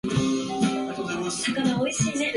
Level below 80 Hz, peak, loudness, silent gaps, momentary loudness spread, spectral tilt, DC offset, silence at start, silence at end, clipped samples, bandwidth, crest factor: -54 dBFS; -10 dBFS; -25 LUFS; none; 5 LU; -4.5 dB/octave; under 0.1%; 0.05 s; 0 s; under 0.1%; 11.5 kHz; 16 dB